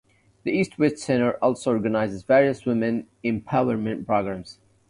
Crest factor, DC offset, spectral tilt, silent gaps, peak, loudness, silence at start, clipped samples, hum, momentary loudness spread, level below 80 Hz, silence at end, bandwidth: 18 dB; under 0.1%; -6.5 dB/octave; none; -6 dBFS; -24 LUFS; 0.45 s; under 0.1%; none; 9 LU; -56 dBFS; 0.35 s; 11 kHz